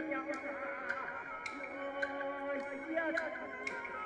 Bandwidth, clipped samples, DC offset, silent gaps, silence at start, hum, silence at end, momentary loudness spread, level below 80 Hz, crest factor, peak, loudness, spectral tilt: 11 kHz; under 0.1%; under 0.1%; none; 0 s; none; 0 s; 6 LU; -74 dBFS; 18 dB; -22 dBFS; -40 LUFS; -4 dB/octave